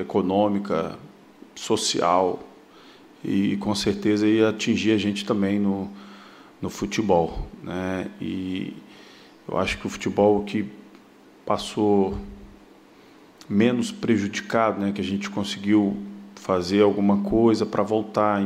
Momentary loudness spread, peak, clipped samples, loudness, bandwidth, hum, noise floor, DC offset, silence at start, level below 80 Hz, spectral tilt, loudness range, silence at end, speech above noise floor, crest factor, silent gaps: 16 LU; -6 dBFS; under 0.1%; -23 LUFS; 13.5 kHz; none; -51 dBFS; under 0.1%; 0 s; -48 dBFS; -5.5 dB/octave; 5 LU; 0 s; 28 dB; 18 dB; none